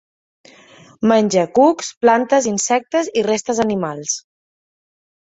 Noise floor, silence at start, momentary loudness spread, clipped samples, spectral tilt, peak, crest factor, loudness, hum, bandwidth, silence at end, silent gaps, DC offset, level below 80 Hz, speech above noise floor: -46 dBFS; 1 s; 8 LU; under 0.1%; -4 dB/octave; -2 dBFS; 16 dB; -17 LUFS; none; 8.2 kHz; 1.1 s; 1.97-2.01 s; under 0.1%; -60 dBFS; 29 dB